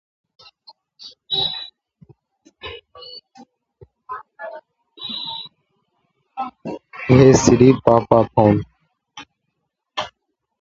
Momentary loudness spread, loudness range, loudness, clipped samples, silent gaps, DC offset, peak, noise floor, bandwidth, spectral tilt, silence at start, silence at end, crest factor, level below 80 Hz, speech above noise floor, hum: 27 LU; 18 LU; -16 LUFS; under 0.1%; none; under 0.1%; 0 dBFS; -76 dBFS; 7.8 kHz; -5.5 dB/octave; 1.05 s; 0.55 s; 20 dB; -46 dBFS; 63 dB; none